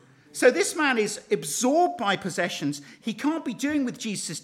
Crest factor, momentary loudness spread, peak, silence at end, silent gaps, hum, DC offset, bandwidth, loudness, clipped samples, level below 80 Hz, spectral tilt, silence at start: 20 dB; 9 LU; -6 dBFS; 0 s; none; none; under 0.1%; 16.5 kHz; -25 LUFS; under 0.1%; -72 dBFS; -3.5 dB/octave; 0.35 s